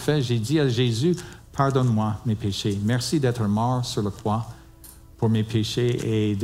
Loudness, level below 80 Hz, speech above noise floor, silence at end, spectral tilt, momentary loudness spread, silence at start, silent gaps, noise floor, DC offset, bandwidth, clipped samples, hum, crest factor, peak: -24 LUFS; -50 dBFS; 24 dB; 0 s; -6 dB/octave; 5 LU; 0 s; none; -46 dBFS; under 0.1%; 15.5 kHz; under 0.1%; none; 16 dB; -8 dBFS